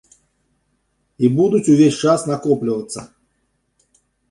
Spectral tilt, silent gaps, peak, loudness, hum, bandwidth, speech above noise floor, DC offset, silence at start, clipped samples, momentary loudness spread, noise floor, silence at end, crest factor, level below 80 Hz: -6.5 dB/octave; none; -2 dBFS; -16 LUFS; none; 11.5 kHz; 52 dB; under 0.1%; 1.2 s; under 0.1%; 12 LU; -68 dBFS; 1.25 s; 16 dB; -58 dBFS